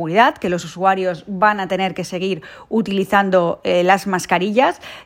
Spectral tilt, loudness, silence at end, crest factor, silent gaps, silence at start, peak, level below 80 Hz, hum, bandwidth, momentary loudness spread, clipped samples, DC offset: -5 dB/octave; -18 LUFS; 0.05 s; 18 dB; none; 0 s; 0 dBFS; -56 dBFS; none; 16 kHz; 8 LU; under 0.1%; under 0.1%